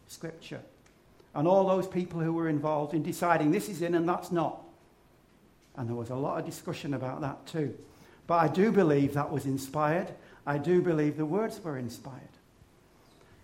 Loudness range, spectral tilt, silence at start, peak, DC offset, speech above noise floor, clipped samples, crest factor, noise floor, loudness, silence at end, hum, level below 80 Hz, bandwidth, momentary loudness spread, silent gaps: 8 LU; -7 dB/octave; 0.1 s; -10 dBFS; under 0.1%; 32 dB; under 0.1%; 20 dB; -62 dBFS; -30 LUFS; 1.15 s; none; -66 dBFS; 16 kHz; 17 LU; none